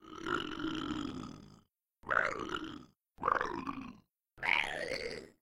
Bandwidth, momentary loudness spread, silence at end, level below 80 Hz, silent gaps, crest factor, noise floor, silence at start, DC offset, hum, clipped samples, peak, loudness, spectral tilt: 16.5 kHz; 17 LU; 0.15 s; -60 dBFS; none; 24 dB; -67 dBFS; 0 s; under 0.1%; none; under 0.1%; -14 dBFS; -36 LUFS; -4 dB/octave